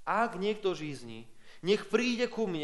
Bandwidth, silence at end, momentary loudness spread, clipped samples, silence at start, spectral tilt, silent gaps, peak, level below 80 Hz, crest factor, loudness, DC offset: 11.5 kHz; 0 s; 15 LU; under 0.1%; 0 s; -5 dB/octave; none; -12 dBFS; -66 dBFS; 20 dB; -32 LUFS; under 0.1%